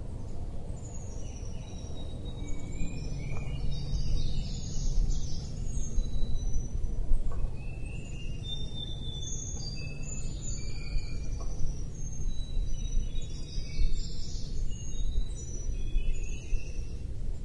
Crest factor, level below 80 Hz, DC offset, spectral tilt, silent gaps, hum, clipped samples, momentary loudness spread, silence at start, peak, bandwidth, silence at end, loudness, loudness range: 16 dB; -32 dBFS; under 0.1%; -4.5 dB/octave; none; none; under 0.1%; 6 LU; 0 s; -12 dBFS; 8.6 kHz; 0 s; -38 LUFS; 3 LU